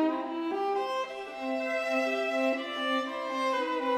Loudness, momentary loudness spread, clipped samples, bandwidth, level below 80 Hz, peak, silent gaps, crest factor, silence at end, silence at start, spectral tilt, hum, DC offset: -31 LUFS; 5 LU; under 0.1%; 16 kHz; -74 dBFS; -16 dBFS; none; 14 dB; 0 s; 0 s; -2.5 dB/octave; none; under 0.1%